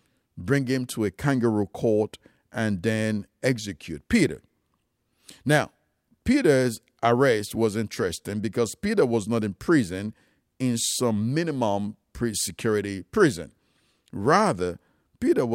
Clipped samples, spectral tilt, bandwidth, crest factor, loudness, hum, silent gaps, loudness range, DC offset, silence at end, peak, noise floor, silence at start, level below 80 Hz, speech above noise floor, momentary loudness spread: under 0.1%; -5 dB/octave; 16 kHz; 20 dB; -25 LUFS; none; none; 3 LU; under 0.1%; 0 s; -6 dBFS; -73 dBFS; 0.35 s; -54 dBFS; 49 dB; 12 LU